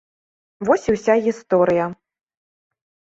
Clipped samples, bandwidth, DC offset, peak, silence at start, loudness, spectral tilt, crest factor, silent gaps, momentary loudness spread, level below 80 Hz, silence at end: under 0.1%; 8 kHz; under 0.1%; -2 dBFS; 0.6 s; -19 LUFS; -6.5 dB/octave; 18 dB; none; 8 LU; -54 dBFS; 1.15 s